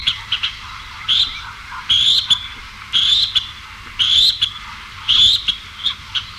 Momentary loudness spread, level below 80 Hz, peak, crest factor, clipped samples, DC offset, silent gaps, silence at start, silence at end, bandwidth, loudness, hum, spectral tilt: 20 LU; -42 dBFS; -2 dBFS; 16 dB; under 0.1%; under 0.1%; none; 0 s; 0 s; 16 kHz; -14 LUFS; none; 0.5 dB/octave